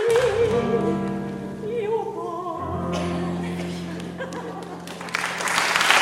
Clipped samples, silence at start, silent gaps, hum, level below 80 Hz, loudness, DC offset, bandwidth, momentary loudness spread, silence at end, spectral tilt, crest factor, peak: under 0.1%; 0 s; none; none; -50 dBFS; -25 LUFS; under 0.1%; 16 kHz; 12 LU; 0 s; -4 dB/octave; 24 dB; 0 dBFS